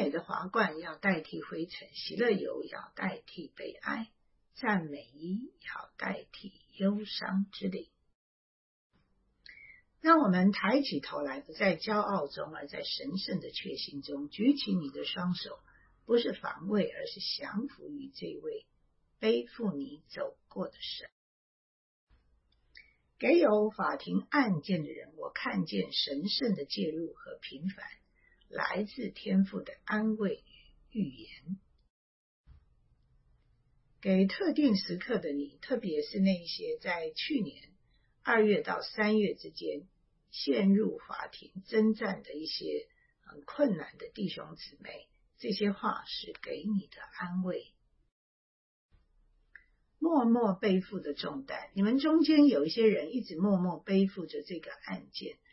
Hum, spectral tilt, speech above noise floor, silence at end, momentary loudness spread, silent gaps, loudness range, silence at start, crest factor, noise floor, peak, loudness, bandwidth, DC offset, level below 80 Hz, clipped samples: none; -9 dB/octave; 40 dB; 0.2 s; 16 LU; 8.15-8.90 s, 21.12-22.07 s, 31.90-32.44 s, 48.12-48.89 s; 9 LU; 0 s; 22 dB; -72 dBFS; -10 dBFS; -32 LUFS; 6 kHz; under 0.1%; -70 dBFS; under 0.1%